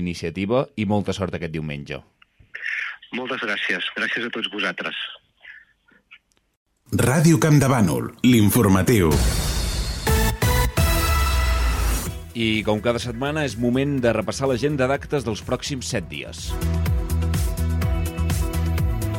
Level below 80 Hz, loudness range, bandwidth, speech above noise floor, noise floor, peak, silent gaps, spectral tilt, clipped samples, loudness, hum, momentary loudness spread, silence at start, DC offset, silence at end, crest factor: -28 dBFS; 8 LU; 17 kHz; 37 dB; -58 dBFS; -6 dBFS; 6.57-6.66 s; -5.5 dB/octave; under 0.1%; -22 LUFS; none; 12 LU; 0 s; under 0.1%; 0 s; 16 dB